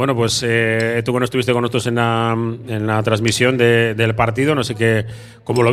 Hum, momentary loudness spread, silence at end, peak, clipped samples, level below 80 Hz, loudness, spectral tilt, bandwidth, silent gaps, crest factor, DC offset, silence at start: none; 7 LU; 0 s; 0 dBFS; under 0.1%; -48 dBFS; -17 LUFS; -5 dB/octave; 13.5 kHz; none; 16 dB; under 0.1%; 0 s